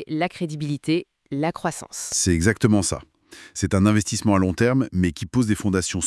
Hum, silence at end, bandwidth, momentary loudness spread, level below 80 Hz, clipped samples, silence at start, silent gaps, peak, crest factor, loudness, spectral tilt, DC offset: none; 0 s; 12 kHz; 10 LU; -48 dBFS; under 0.1%; 0 s; none; -2 dBFS; 20 dB; -22 LUFS; -5 dB/octave; under 0.1%